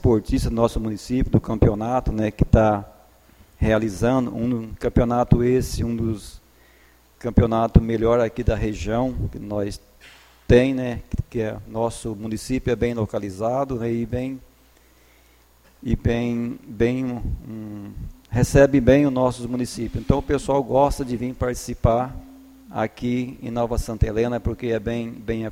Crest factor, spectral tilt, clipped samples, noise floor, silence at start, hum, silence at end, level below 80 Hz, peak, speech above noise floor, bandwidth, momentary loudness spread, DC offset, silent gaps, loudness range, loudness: 22 dB; -7.5 dB/octave; under 0.1%; -55 dBFS; 0 s; none; 0 s; -32 dBFS; 0 dBFS; 34 dB; 16.5 kHz; 12 LU; under 0.1%; none; 6 LU; -22 LUFS